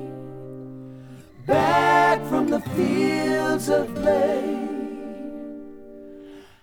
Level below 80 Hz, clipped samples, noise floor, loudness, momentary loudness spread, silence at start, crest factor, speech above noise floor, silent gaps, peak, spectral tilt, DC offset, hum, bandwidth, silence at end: -54 dBFS; under 0.1%; -43 dBFS; -21 LUFS; 24 LU; 0 s; 16 dB; 21 dB; none; -6 dBFS; -5.5 dB/octave; under 0.1%; none; over 20 kHz; 0.15 s